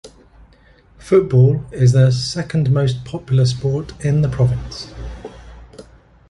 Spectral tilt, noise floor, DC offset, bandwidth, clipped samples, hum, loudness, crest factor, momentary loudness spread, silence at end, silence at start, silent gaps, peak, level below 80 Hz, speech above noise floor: -7 dB/octave; -49 dBFS; under 0.1%; 11 kHz; under 0.1%; none; -17 LUFS; 16 dB; 18 LU; 0.5 s; 0.05 s; none; -2 dBFS; -38 dBFS; 34 dB